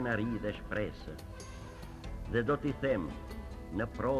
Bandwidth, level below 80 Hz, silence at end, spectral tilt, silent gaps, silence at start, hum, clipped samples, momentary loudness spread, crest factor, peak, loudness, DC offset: 14 kHz; -48 dBFS; 0 s; -7 dB/octave; none; 0 s; none; under 0.1%; 14 LU; 18 dB; -16 dBFS; -37 LUFS; under 0.1%